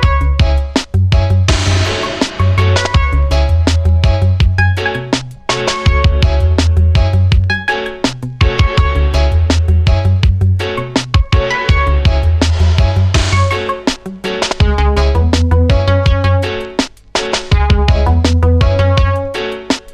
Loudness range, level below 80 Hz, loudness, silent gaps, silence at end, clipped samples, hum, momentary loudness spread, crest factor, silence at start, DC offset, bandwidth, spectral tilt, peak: 1 LU; -16 dBFS; -13 LUFS; none; 0 s; under 0.1%; none; 6 LU; 12 dB; 0 s; under 0.1%; 10 kHz; -5.5 dB/octave; 0 dBFS